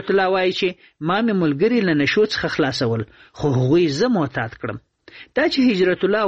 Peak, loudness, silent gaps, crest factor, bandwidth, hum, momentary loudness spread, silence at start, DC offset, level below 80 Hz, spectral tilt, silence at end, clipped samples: -6 dBFS; -19 LUFS; none; 14 dB; 8.4 kHz; none; 10 LU; 0 s; under 0.1%; -52 dBFS; -6 dB/octave; 0 s; under 0.1%